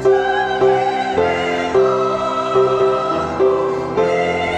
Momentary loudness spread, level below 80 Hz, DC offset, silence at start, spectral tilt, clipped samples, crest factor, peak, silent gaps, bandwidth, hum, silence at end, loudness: 4 LU; -46 dBFS; under 0.1%; 0 s; -5.5 dB/octave; under 0.1%; 14 dB; -2 dBFS; none; 9 kHz; none; 0 s; -16 LUFS